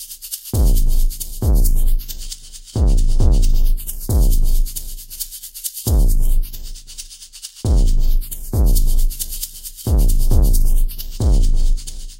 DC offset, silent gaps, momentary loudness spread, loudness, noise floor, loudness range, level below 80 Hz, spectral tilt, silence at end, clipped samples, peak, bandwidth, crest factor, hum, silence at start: under 0.1%; none; 13 LU; -21 LUFS; -37 dBFS; 2 LU; -14 dBFS; -5.5 dB/octave; 0.05 s; under 0.1%; -2 dBFS; 16 kHz; 12 dB; none; 0 s